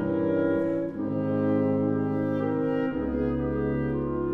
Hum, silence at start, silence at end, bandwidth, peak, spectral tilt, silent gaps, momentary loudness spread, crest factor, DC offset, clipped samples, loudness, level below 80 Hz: none; 0 s; 0 s; 4.6 kHz; -14 dBFS; -10.5 dB/octave; none; 4 LU; 12 dB; under 0.1%; under 0.1%; -27 LUFS; -44 dBFS